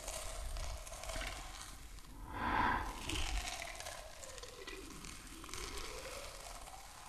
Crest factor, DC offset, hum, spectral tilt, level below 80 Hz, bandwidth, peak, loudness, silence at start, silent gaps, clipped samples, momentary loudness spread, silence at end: 22 dB; under 0.1%; none; -2.5 dB/octave; -48 dBFS; 14 kHz; -22 dBFS; -43 LUFS; 0 s; none; under 0.1%; 13 LU; 0 s